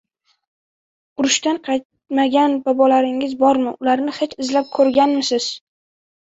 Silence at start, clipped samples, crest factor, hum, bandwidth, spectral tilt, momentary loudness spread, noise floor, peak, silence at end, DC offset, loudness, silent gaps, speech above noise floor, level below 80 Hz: 1.2 s; under 0.1%; 16 dB; none; 8 kHz; -2 dB/octave; 9 LU; under -90 dBFS; -2 dBFS; 0.65 s; under 0.1%; -18 LUFS; 1.85-1.90 s; over 73 dB; -62 dBFS